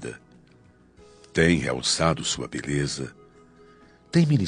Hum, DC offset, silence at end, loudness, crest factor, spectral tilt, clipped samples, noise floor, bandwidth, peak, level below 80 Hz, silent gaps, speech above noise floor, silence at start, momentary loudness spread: none; under 0.1%; 0 s; -24 LUFS; 22 dB; -4.5 dB/octave; under 0.1%; -55 dBFS; 10 kHz; -6 dBFS; -50 dBFS; none; 32 dB; 0 s; 15 LU